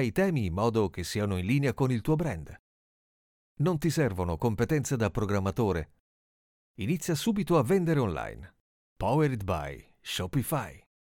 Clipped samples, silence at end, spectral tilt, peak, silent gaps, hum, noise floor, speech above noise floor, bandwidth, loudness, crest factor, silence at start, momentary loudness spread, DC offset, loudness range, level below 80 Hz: under 0.1%; 0.4 s; -6.5 dB/octave; -12 dBFS; 2.59-3.56 s, 6.00-6.74 s, 8.60-8.96 s; none; under -90 dBFS; over 62 dB; 18 kHz; -29 LUFS; 18 dB; 0 s; 11 LU; under 0.1%; 2 LU; -50 dBFS